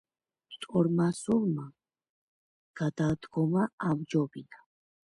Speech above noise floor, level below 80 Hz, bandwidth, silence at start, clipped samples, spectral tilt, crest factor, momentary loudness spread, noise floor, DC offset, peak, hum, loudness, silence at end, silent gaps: 28 dB; -64 dBFS; 11.5 kHz; 0.5 s; under 0.1%; -7.5 dB/octave; 18 dB; 15 LU; -57 dBFS; under 0.1%; -14 dBFS; none; -30 LUFS; 0.5 s; 2.09-2.74 s, 3.73-3.78 s